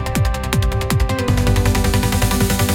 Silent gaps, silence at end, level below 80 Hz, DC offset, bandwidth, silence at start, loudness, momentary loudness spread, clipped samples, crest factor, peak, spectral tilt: none; 0 s; -22 dBFS; under 0.1%; 17 kHz; 0 s; -17 LUFS; 3 LU; under 0.1%; 16 dB; -2 dBFS; -5 dB/octave